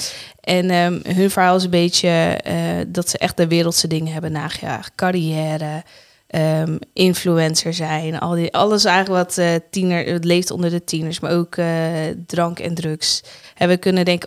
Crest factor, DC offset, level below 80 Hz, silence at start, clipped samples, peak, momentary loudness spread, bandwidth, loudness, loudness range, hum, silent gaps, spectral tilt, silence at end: 18 dB; under 0.1%; -56 dBFS; 0 s; under 0.1%; -2 dBFS; 9 LU; 16 kHz; -18 LUFS; 4 LU; none; none; -4.5 dB/octave; 0 s